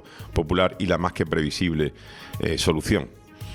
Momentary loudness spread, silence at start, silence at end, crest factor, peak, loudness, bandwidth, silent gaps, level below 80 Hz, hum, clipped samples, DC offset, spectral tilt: 15 LU; 0.05 s; 0 s; 20 dB; -6 dBFS; -24 LUFS; 19.5 kHz; none; -40 dBFS; none; under 0.1%; under 0.1%; -5.5 dB/octave